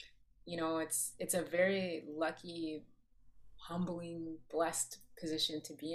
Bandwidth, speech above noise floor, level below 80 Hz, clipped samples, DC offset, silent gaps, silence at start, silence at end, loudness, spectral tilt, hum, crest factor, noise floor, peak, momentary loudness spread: 15 kHz; 22 dB; -70 dBFS; under 0.1%; under 0.1%; none; 0 s; 0 s; -38 LUFS; -3 dB/octave; none; 20 dB; -61 dBFS; -20 dBFS; 13 LU